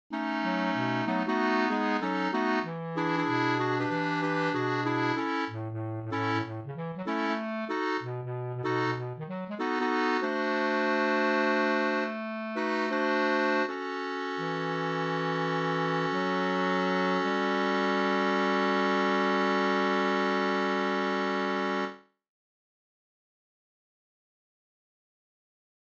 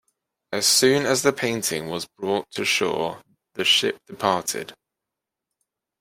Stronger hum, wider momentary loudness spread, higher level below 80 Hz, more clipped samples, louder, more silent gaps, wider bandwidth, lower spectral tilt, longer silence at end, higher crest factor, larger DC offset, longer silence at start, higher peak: neither; second, 8 LU vs 14 LU; second, -76 dBFS vs -66 dBFS; neither; second, -29 LUFS vs -22 LUFS; neither; second, 8 kHz vs 16 kHz; first, -6 dB/octave vs -2 dB/octave; first, 3.85 s vs 1.3 s; about the same, 16 dB vs 20 dB; neither; second, 0.1 s vs 0.5 s; second, -14 dBFS vs -4 dBFS